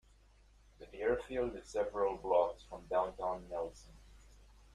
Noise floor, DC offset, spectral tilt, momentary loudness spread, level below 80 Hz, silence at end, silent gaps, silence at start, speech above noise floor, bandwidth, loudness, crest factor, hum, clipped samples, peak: -65 dBFS; under 0.1%; -5.5 dB/octave; 13 LU; -58 dBFS; 0.4 s; none; 0.8 s; 28 dB; 11 kHz; -37 LUFS; 20 dB; none; under 0.1%; -18 dBFS